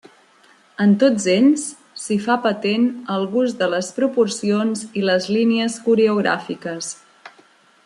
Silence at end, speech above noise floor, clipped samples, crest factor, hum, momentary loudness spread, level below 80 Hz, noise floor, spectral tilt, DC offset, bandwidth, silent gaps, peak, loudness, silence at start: 0.55 s; 35 dB; under 0.1%; 16 dB; none; 12 LU; -68 dBFS; -53 dBFS; -5 dB/octave; under 0.1%; 11.5 kHz; none; -4 dBFS; -19 LUFS; 0.8 s